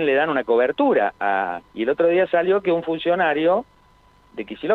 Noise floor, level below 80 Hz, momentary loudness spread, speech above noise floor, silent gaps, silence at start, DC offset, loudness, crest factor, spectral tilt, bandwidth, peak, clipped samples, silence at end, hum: -54 dBFS; -60 dBFS; 10 LU; 35 dB; none; 0 s; under 0.1%; -20 LUFS; 14 dB; -7.5 dB/octave; 4.4 kHz; -6 dBFS; under 0.1%; 0 s; 50 Hz at -60 dBFS